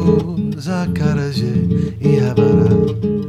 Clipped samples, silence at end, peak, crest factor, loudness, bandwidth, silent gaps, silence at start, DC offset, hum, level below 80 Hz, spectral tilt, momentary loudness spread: under 0.1%; 0 s; -2 dBFS; 14 dB; -16 LUFS; 11.5 kHz; none; 0 s; under 0.1%; none; -42 dBFS; -8.5 dB/octave; 8 LU